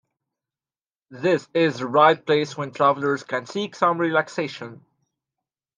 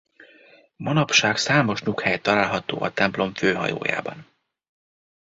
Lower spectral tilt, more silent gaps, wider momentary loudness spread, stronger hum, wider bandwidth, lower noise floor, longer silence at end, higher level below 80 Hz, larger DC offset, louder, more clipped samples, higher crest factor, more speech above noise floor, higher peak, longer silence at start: first, -5.5 dB/octave vs -4 dB/octave; neither; first, 12 LU vs 8 LU; neither; first, 9.6 kHz vs 8 kHz; first, under -90 dBFS vs -53 dBFS; about the same, 1.05 s vs 1 s; second, -74 dBFS vs -58 dBFS; neither; about the same, -22 LUFS vs -22 LUFS; neither; about the same, 22 dB vs 22 dB; first, over 68 dB vs 31 dB; about the same, -2 dBFS vs -2 dBFS; first, 1.1 s vs 0.2 s